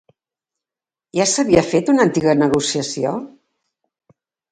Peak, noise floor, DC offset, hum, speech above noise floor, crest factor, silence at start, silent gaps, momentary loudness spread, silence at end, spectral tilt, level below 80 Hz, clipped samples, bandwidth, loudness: 0 dBFS; -90 dBFS; under 0.1%; none; 73 dB; 20 dB; 1.15 s; none; 8 LU; 1.25 s; -4.5 dB/octave; -52 dBFS; under 0.1%; 9.6 kHz; -17 LUFS